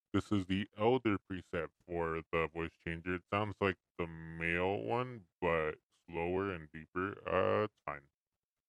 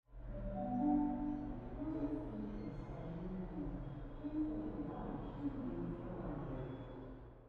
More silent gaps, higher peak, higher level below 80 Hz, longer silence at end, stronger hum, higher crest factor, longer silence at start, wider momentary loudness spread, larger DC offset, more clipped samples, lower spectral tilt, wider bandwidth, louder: first, 2.27-2.31 s, 3.91-3.95 s, 5.35-5.39 s, 5.85-5.90 s, 6.89-6.93 s vs none; first, -16 dBFS vs -26 dBFS; second, -62 dBFS vs -52 dBFS; first, 0.7 s vs 0 s; neither; about the same, 20 dB vs 16 dB; about the same, 0.15 s vs 0.1 s; about the same, 11 LU vs 11 LU; neither; neither; second, -7.5 dB/octave vs -10.5 dB/octave; first, 10.5 kHz vs 4.5 kHz; first, -37 LUFS vs -44 LUFS